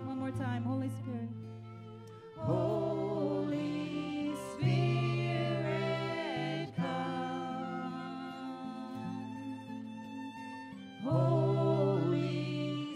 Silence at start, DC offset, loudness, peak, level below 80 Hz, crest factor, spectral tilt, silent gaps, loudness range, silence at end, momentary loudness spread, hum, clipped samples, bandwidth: 0 s; under 0.1%; -35 LUFS; -18 dBFS; -70 dBFS; 16 dB; -7.5 dB/octave; none; 7 LU; 0 s; 14 LU; none; under 0.1%; 10.5 kHz